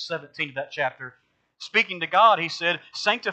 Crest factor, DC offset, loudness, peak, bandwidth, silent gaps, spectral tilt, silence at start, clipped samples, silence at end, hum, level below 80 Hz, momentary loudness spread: 20 dB; under 0.1%; -23 LUFS; -4 dBFS; 8.8 kHz; none; -3 dB/octave; 0 s; under 0.1%; 0 s; none; -80 dBFS; 17 LU